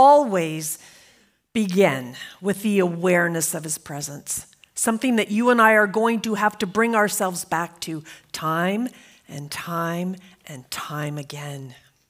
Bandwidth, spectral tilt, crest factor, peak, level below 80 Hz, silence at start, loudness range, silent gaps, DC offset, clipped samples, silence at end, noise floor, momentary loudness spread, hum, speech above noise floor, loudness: 16 kHz; -4.5 dB/octave; 20 dB; -2 dBFS; -66 dBFS; 0 s; 8 LU; none; under 0.1%; under 0.1%; 0.35 s; -58 dBFS; 17 LU; none; 36 dB; -22 LUFS